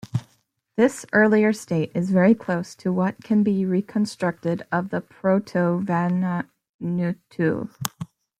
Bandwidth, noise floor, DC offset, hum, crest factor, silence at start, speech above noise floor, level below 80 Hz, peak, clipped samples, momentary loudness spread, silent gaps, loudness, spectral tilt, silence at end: 16 kHz; -66 dBFS; under 0.1%; none; 22 dB; 0.05 s; 44 dB; -64 dBFS; -2 dBFS; under 0.1%; 12 LU; 6.74-6.79 s; -23 LUFS; -7 dB/octave; 0.35 s